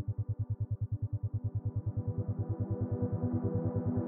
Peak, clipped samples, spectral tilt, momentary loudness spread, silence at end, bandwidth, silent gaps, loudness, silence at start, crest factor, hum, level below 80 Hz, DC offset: -20 dBFS; under 0.1%; -12 dB/octave; 3 LU; 0 s; 1.9 kHz; none; -36 LUFS; 0 s; 14 dB; none; -52 dBFS; under 0.1%